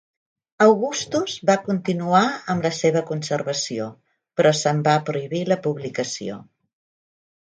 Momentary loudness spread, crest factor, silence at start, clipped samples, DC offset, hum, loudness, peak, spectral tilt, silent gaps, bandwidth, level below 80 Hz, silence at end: 10 LU; 20 dB; 0.6 s; under 0.1%; under 0.1%; none; -21 LUFS; -2 dBFS; -5 dB/octave; none; 9.6 kHz; -66 dBFS; 1.1 s